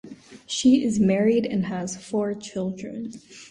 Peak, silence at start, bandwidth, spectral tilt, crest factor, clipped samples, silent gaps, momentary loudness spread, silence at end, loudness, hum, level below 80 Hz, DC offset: -8 dBFS; 0.05 s; 11 kHz; -5.5 dB/octave; 16 dB; under 0.1%; none; 16 LU; 0.05 s; -23 LUFS; none; -58 dBFS; under 0.1%